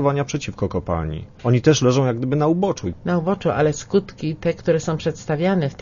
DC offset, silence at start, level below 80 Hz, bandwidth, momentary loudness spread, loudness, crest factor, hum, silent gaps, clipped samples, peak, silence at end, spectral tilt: under 0.1%; 0 s; -44 dBFS; 7.4 kHz; 9 LU; -21 LUFS; 16 dB; none; none; under 0.1%; -4 dBFS; 0.05 s; -6.5 dB/octave